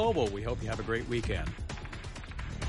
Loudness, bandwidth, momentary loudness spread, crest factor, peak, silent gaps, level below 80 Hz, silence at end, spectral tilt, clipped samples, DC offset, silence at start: -35 LUFS; 11.5 kHz; 11 LU; 16 dB; -16 dBFS; none; -42 dBFS; 0 s; -6 dB/octave; under 0.1%; under 0.1%; 0 s